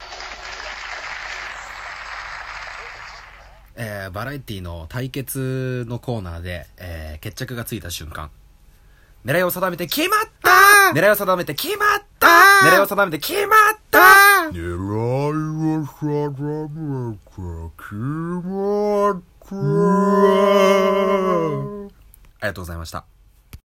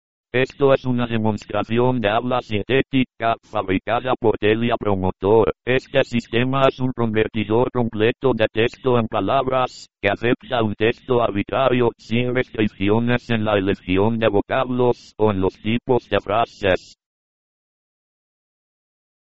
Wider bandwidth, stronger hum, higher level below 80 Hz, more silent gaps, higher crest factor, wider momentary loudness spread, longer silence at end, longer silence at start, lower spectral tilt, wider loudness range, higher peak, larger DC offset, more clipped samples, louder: first, 17 kHz vs 8 kHz; neither; about the same, -46 dBFS vs -46 dBFS; neither; about the same, 18 dB vs 20 dB; first, 22 LU vs 5 LU; second, 0.15 s vs 2.2 s; second, 0 s vs 0.25 s; about the same, -4 dB/octave vs -5 dB/octave; first, 18 LU vs 2 LU; about the same, 0 dBFS vs 0 dBFS; second, under 0.1% vs 2%; neither; first, -16 LUFS vs -20 LUFS